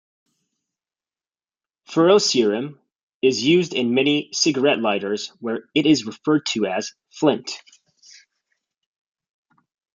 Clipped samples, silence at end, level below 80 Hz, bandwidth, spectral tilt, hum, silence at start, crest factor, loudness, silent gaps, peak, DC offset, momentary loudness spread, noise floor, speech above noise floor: under 0.1%; 2.4 s; -70 dBFS; 9.4 kHz; -4 dB/octave; none; 1.9 s; 20 dB; -20 LUFS; 3.03-3.08 s, 3.14-3.21 s; -4 dBFS; under 0.1%; 12 LU; under -90 dBFS; over 70 dB